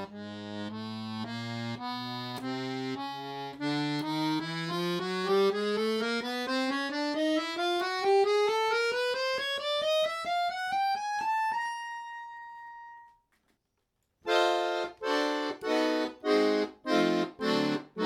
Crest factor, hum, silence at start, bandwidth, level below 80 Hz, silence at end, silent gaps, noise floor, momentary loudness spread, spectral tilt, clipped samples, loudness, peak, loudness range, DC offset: 18 dB; none; 0 s; 16 kHz; -74 dBFS; 0 s; none; -79 dBFS; 12 LU; -4.5 dB/octave; under 0.1%; -30 LUFS; -14 dBFS; 7 LU; under 0.1%